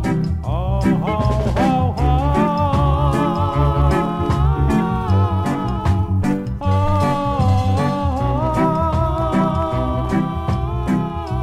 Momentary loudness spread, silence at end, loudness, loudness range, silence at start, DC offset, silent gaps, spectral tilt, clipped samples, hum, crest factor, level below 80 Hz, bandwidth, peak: 4 LU; 0 s; -18 LUFS; 2 LU; 0 s; under 0.1%; none; -8 dB/octave; under 0.1%; none; 14 dB; -26 dBFS; 12.5 kHz; -4 dBFS